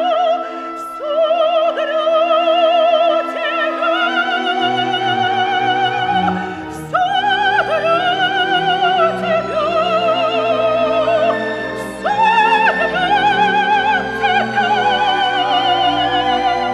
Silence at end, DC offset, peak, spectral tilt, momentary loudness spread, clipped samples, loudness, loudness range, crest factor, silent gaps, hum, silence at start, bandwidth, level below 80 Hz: 0 s; under 0.1%; -2 dBFS; -4.5 dB/octave; 6 LU; under 0.1%; -15 LUFS; 2 LU; 14 dB; none; none; 0 s; 12 kHz; -50 dBFS